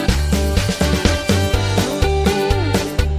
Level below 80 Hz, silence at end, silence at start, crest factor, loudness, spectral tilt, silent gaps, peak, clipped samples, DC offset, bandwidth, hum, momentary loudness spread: -22 dBFS; 0 s; 0 s; 16 dB; -17 LUFS; -5 dB/octave; none; -2 dBFS; under 0.1%; under 0.1%; 16 kHz; none; 2 LU